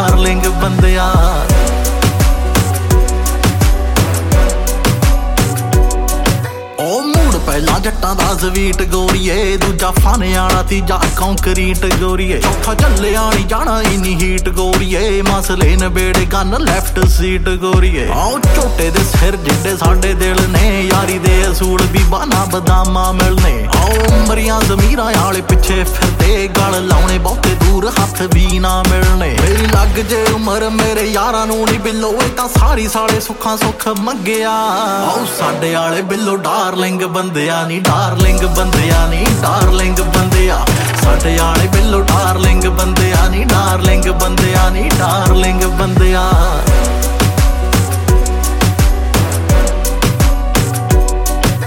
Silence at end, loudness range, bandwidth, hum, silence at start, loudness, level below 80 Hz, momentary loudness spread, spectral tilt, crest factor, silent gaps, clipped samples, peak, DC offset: 0 s; 2 LU; 17 kHz; none; 0 s; -13 LUFS; -14 dBFS; 3 LU; -5 dB/octave; 12 dB; none; under 0.1%; 0 dBFS; under 0.1%